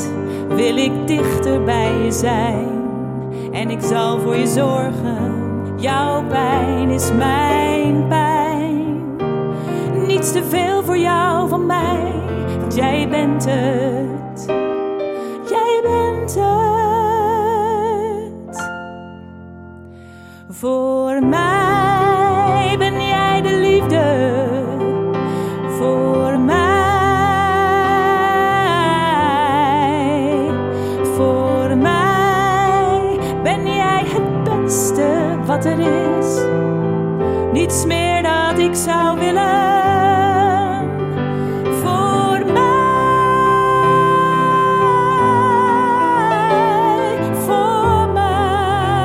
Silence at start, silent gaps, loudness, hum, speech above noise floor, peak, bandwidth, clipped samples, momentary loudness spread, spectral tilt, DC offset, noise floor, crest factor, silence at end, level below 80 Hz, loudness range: 0 s; none; -16 LUFS; none; 22 dB; -2 dBFS; 16 kHz; under 0.1%; 8 LU; -5.5 dB/octave; under 0.1%; -38 dBFS; 14 dB; 0 s; -40 dBFS; 5 LU